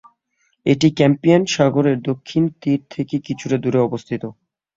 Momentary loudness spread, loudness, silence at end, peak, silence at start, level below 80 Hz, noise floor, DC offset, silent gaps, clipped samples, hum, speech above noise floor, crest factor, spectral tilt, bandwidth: 10 LU; -18 LUFS; 0.45 s; 0 dBFS; 0.65 s; -56 dBFS; -67 dBFS; under 0.1%; none; under 0.1%; none; 49 dB; 18 dB; -6.5 dB/octave; 7.8 kHz